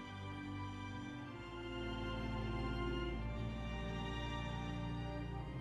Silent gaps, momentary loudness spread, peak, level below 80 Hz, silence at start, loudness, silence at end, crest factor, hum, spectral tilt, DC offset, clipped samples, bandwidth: none; 6 LU; -28 dBFS; -48 dBFS; 0 s; -44 LUFS; 0 s; 14 dB; none; -6.5 dB/octave; under 0.1%; under 0.1%; 10 kHz